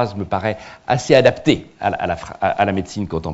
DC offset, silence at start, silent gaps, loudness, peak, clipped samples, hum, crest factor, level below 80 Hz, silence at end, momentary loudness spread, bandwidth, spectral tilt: under 0.1%; 0 s; none; -19 LUFS; 0 dBFS; under 0.1%; none; 18 dB; -46 dBFS; 0 s; 11 LU; 8 kHz; -5.5 dB/octave